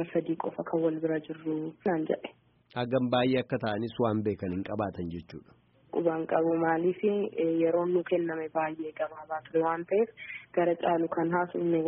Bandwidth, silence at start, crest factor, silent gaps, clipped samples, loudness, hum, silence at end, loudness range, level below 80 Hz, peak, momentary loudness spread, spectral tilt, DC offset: 5.2 kHz; 0 s; 18 dB; none; under 0.1%; -30 LUFS; none; 0 s; 2 LU; -66 dBFS; -12 dBFS; 9 LU; -5.5 dB/octave; under 0.1%